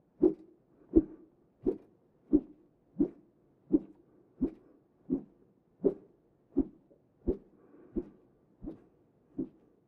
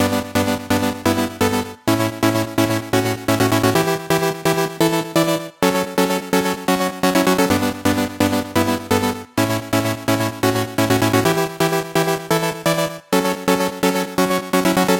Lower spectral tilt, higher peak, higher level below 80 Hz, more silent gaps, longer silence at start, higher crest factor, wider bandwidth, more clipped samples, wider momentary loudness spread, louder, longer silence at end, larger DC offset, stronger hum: first, -12.5 dB/octave vs -4.5 dB/octave; second, -10 dBFS vs 0 dBFS; about the same, -52 dBFS vs -48 dBFS; neither; first, 0.2 s vs 0 s; first, 26 dB vs 18 dB; second, 2.3 kHz vs 17 kHz; neither; first, 19 LU vs 4 LU; second, -35 LUFS vs -19 LUFS; first, 0.4 s vs 0 s; neither; neither